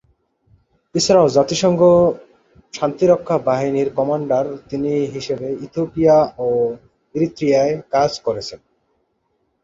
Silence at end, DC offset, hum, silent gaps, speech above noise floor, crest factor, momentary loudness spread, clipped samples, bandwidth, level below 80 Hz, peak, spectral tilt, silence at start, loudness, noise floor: 1.05 s; under 0.1%; none; none; 51 dB; 16 dB; 12 LU; under 0.1%; 7.8 kHz; -52 dBFS; -2 dBFS; -5.5 dB/octave; 0.95 s; -17 LUFS; -68 dBFS